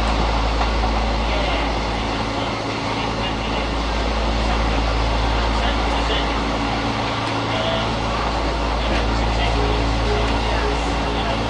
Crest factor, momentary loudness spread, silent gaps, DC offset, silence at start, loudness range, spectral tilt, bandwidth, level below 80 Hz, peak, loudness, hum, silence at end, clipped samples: 14 dB; 3 LU; none; under 0.1%; 0 s; 1 LU; -5 dB/octave; 10 kHz; -24 dBFS; -6 dBFS; -21 LUFS; none; 0 s; under 0.1%